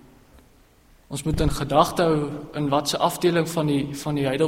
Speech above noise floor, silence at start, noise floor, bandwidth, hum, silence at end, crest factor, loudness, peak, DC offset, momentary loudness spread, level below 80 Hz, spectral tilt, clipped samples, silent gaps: 33 dB; 1.1 s; -55 dBFS; 16 kHz; none; 0 s; 22 dB; -23 LUFS; -2 dBFS; under 0.1%; 8 LU; -40 dBFS; -5.5 dB/octave; under 0.1%; none